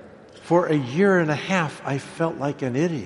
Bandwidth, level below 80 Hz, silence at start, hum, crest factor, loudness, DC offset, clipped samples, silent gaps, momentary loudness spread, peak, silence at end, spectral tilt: 11.5 kHz; -62 dBFS; 0 s; none; 18 dB; -23 LUFS; under 0.1%; under 0.1%; none; 8 LU; -6 dBFS; 0 s; -6.5 dB/octave